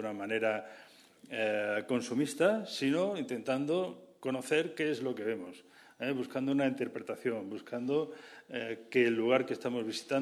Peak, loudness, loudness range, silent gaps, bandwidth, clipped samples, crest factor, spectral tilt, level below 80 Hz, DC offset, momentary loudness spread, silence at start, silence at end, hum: -14 dBFS; -34 LUFS; 3 LU; none; 14 kHz; under 0.1%; 20 dB; -5 dB/octave; -82 dBFS; under 0.1%; 11 LU; 0 s; 0 s; none